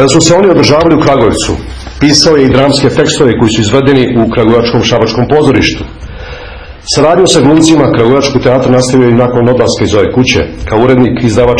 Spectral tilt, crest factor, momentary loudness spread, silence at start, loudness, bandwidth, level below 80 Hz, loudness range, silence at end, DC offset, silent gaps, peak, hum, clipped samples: -5 dB/octave; 6 dB; 9 LU; 0 s; -7 LUFS; 11 kHz; -28 dBFS; 2 LU; 0 s; 1%; none; 0 dBFS; none; 4%